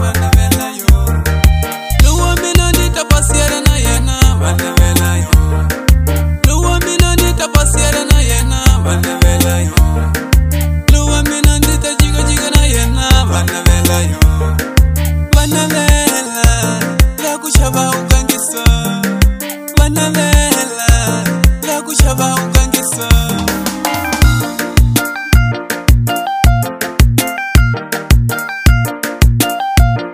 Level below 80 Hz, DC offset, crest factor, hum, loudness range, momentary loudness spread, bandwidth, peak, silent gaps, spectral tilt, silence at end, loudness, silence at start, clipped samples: -14 dBFS; under 0.1%; 10 dB; none; 2 LU; 4 LU; 16.5 kHz; 0 dBFS; none; -4.5 dB/octave; 0 s; -12 LUFS; 0 s; 0.5%